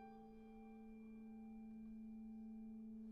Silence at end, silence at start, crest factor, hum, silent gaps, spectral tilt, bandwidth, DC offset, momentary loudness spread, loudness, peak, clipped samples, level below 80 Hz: 0 s; 0 s; 8 dB; none; none; -8.5 dB/octave; 5 kHz; under 0.1%; 5 LU; -57 LUFS; -48 dBFS; under 0.1%; -72 dBFS